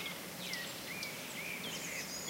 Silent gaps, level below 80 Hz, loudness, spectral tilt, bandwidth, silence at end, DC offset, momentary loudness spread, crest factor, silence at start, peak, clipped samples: none; -72 dBFS; -41 LUFS; -1.5 dB/octave; 16 kHz; 0 s; under 0.1%; 2 LU; 18 dB; 0 s; -24 dBFS; under 0.1%